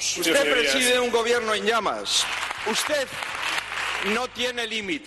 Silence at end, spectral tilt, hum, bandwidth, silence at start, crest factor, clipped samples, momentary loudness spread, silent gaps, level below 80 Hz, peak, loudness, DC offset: 0 s; -1 dB/octave; none; 12.5 kHz; 0 s; 16 dB; under 0.1%; 7 LU; none; -56 dBFS; -8 dBFS; -23 LUFS; under 0.1%